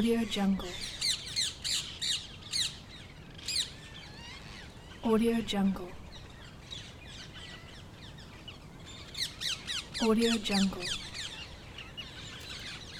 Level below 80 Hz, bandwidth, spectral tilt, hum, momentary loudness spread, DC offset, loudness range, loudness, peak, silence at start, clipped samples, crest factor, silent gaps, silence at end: -54 dBFS; 18 kHz; -3.5 dB/octave; none; 19 LU; under 0.1%; 8 LU; -32 LUFS; -16 dBFS; 0 s; under 0.1%; 18 dB; none; 0 s